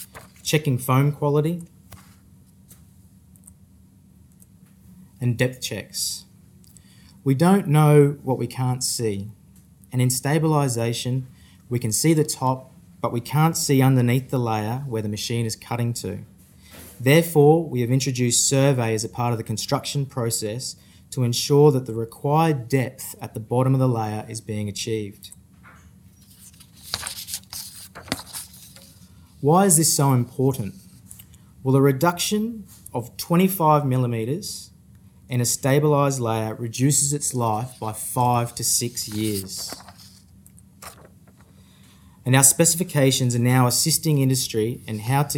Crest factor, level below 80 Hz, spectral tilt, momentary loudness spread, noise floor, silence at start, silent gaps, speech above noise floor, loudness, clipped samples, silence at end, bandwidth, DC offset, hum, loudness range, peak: 22 dB; -58 dBFS; -5 dB/octave; 15 LU; -52 dBFS; 0 s; none; 31 dB; -21 LUFS; under 0.1%; 0 s; 17.5 kHz; under 0.1%; none; 11 LU; 0 dBFS